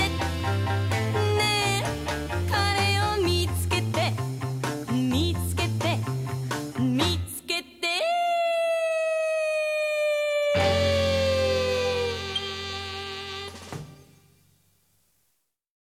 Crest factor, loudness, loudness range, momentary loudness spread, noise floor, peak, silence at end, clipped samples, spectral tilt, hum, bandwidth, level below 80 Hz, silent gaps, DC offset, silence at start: 16 dB; -26 LUFS; 6 LU; 8 LU; -74 dBFS; -10 dBFS; 1.95 s; under 0.1%; -5 dB/octave; none; 16 kHz; -50 dBFS; none; under 0.1%; 0 s